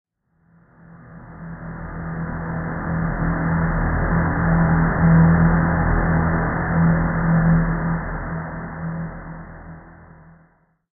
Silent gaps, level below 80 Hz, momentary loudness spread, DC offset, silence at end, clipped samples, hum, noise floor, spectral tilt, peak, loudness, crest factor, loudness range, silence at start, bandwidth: none; -30 dBFS; 19 LU; under 0.1%; 0.9 s; under 0.1%; none; -60 dBFS; -13.5 dB/octave; -4 dBFS; -20 LUFS; 16 dB; 10 LU; 0.9 s; 2.3 kHz